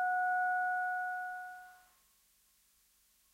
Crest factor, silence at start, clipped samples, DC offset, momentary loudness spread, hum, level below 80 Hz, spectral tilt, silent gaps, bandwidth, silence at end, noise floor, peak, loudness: 12 dB; 0 s; under 0.1%; under 0.1%; 19 LU; 50 Hz at -85 dBFS; -84 dBFS; -1.5 dB/octave; none; 16 kHz; 1.55 s; -71 dBFS; -26 dBFS; -35 LUFS